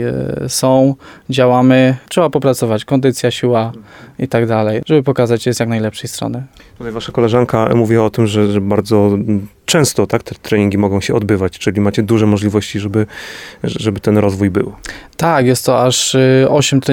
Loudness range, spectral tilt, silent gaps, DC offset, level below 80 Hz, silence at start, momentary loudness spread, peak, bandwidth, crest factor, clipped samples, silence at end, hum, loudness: 3 LU; -5.5 dB/octave; none; under 0.1%; -46 dBFS; 0 s; 11 LU; 0 dBFS; 18 kHz; 14 dB; under 0.1%; 0 s; none; -14 LUFS